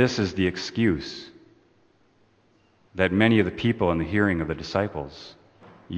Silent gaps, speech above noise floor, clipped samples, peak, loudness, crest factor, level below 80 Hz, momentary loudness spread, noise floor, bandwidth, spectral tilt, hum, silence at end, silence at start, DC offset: none; 38 dB; under 0.1%; -4 dBFS; -24 LUFS; 22 dB; -48 dBFS; 20 LU; -62 dBFS; 8.6 kHz; -6.5 dB/octave; none; 0 s; 0 s; under 0.1%